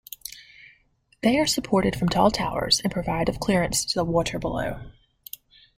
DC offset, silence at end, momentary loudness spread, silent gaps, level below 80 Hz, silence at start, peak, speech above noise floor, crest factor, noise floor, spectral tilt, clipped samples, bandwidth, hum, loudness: under 0.1%; 0.85 s; 19 LU; none; -44 dBFS; 0.25 s; -6 dBFS; 39 dB; 20 dB; -63 dBFS; -4 dB/octave; under 0.1%; 16.5 kHz; none; -23 LUFS